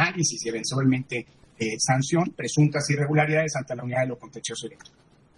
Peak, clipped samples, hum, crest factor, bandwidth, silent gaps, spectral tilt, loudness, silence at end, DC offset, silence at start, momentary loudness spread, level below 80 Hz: -8 dBFS; under 0.1%; none; 18 dB; 11.5 kHz; none; -4.5 dB/octave; -25 LUFS; 0.65 s; under 0.1%; 0 s; 11 LU; -64 dBFS